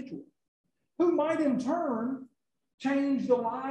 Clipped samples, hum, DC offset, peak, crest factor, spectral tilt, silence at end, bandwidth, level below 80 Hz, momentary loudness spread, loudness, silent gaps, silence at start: under 0.1%; none; under 0.1%; -14 dBFS; 18 dB; -6.5 dB/octave; 0 s; 9 kHz; -76 dBFS; 12 LU; -29 LUFS; 0.48-0.64 s, 2.74-2.78 s; 0 s